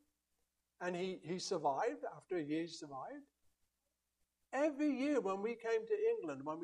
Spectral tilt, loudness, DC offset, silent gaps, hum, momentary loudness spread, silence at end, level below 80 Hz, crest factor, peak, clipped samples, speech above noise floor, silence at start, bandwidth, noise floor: -5 dB/octave; -40 LUFS; under 0.1%; none; none; 12 LU; 0 s; -86 dBFS; 16 dB; -24 dBFS; under 0.1%; 48 dB; 0.8 s; 11 kHz; -88 dBFS